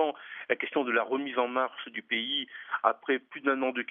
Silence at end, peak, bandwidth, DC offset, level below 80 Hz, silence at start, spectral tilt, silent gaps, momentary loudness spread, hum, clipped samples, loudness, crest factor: 0.05 s; -6 dBFS; 3.8 kHz; under 0.1%; under -90 dBFS; 0 s; 0.5 dB/octave; none; 5 LU; none; under 0.1%; -30 LUFS; 24 dB